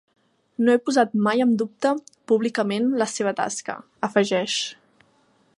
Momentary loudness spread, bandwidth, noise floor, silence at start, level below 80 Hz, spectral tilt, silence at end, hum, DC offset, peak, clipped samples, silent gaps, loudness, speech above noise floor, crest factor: 10 LU; 11.5 kHz; -62 dBFS; 0.6 s; -74 dBFS; -4 dB/octave; 0.85 s; none; under 0.1%; -4 dBFS; under 0.1%; none; -23 LUFS; 40 dB; 20 dB